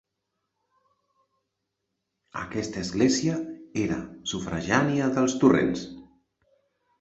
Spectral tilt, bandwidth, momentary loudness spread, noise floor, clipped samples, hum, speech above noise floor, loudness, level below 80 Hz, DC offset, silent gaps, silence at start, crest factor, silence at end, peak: -5 dB/octave; 8.2 kHz; 13 LU; -81 dBFS; under 0.1%; none; 56 dB; -26 LUFS; -54 dBFS; under 0.1%; none; 2.35 s; 22 dB; 0.95 s; -6 dBFS